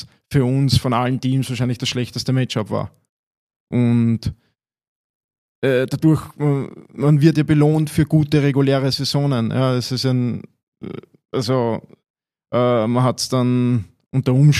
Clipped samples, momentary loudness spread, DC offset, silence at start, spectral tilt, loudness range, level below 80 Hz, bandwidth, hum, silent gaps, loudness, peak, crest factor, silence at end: under 0.1%; 10 LU; under 0.1%; 0 s; -6.5 dB/octave; 6 LU; -46 dBFS; 14 kHz; none; 3.09-3.31 s, 3.37-3.50 s, 3.56-3.67 s, 4.88-5.29 s, 5.38-5.62 s, 10.63-10.72 s, 12.10-12.14 s; -19 LUFS; -2 dBFS; 16 dB; 0 s